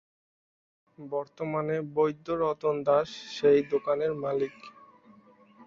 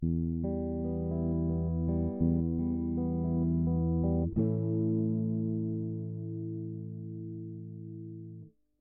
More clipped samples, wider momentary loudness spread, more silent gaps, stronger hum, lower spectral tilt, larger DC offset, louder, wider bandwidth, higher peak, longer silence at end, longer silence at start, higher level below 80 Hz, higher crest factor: neither; about the same, 12 LU vs 14 LU; neither; neither; second, -6.5 dB/octave vs -16 dB/octave; neither; first, -28 LUFS vs -32 LUFS; first, 7.4 kHz vs 1.4 kHz; first, -12 dBFS vs -16 dBFS; second, 0.05 s vs 0.3 s; first, 1 s vs 0 s; second, -68 dBFS vs -44 dBFS; about the same, 18 dB vs 14 dB